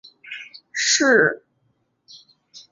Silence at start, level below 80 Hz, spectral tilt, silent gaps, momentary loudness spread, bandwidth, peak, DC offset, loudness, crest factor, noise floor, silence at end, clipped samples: 0.25 s; -70 dBFS; -1.5 dB/octave; none; 21 LU; 7.8 kHz; -4 dBFS; under 0.1%; -18 LUFS; 20 dB; -68 dBFS; 0.15 s; under 0.1%